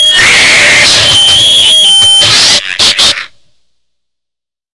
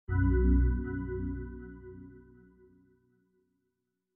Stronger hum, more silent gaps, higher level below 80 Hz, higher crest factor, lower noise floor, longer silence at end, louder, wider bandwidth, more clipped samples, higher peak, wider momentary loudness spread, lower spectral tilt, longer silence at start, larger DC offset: neither; neither; about the same, -38 dBFS vs -34 dBFS; second, 6 dB vs 16 dB; about the same, -80 dBFS vs -83 dBFS; second, 1.5 s vs 1.95 s; first, -2 LUFS vs -31 LUFS; first, 12 kHz vs 2.1 kHz; first, 0.8% vs under 0.1%; first, 0 dBFS vs -16 dBFS; second, 5 LU vs 23 LU; second, 0.5 dB/octave vs -11.5 dB/octave; about the same, 0 s vs 0.1 s; first, 0.6% vs under 0.1%